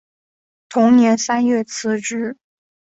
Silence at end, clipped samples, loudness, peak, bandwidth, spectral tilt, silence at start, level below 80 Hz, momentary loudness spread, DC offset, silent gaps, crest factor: 0.65 s; under 0.1%; -17 LUFS; -2 dBFS; 8 kHz; -4 dB/octave; 0.7 s; -64 dBFS; 12 LU; under 0.1%; none; 16 dB